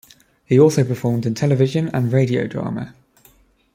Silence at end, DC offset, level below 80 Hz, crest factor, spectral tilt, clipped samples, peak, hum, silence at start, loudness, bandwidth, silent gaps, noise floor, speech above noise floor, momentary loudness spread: 0.85 s; under 0.1%; -56 dBFS; 18 dB; -7.5 dB/octave; under 0.1%; -2 dBFS; none; 0.5 s; -18 LUFS; 15.5 kHz; none; -54 dBFS; 37 dB; 12 LU